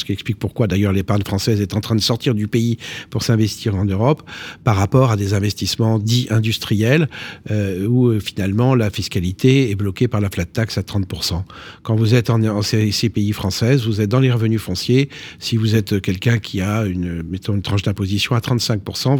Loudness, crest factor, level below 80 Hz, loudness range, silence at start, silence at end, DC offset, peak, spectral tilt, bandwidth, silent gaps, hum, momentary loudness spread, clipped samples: -18 LUFS; 16 dB; -44 dBFS; 2 LU; 0 s; 0 s; under 0.1%; -2 dBFS; -6 dB/octave; 18 kHz; none; none; 7 LU; under 0.1%